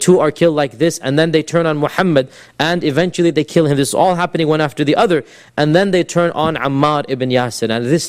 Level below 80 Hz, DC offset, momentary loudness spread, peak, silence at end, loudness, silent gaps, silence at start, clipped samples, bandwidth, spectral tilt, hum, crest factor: -50 dBFS; under 0.1%; 4 LU; 0 dBFS; 0 s; -15 LUFS; none; 0 s; under 0.1%; 15.5 kHz; -5.5 dB/octave; none; 14 dB